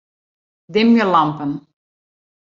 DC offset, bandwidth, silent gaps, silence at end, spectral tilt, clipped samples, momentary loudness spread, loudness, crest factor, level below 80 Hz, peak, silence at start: under 0.1%; 7 kHz; none; 0.8 s; -7 dB/octave; under 0.1%; 13 LU; -16 LUFS; 18 dB; -64 dBFS; -2 dBFS; 0.7 s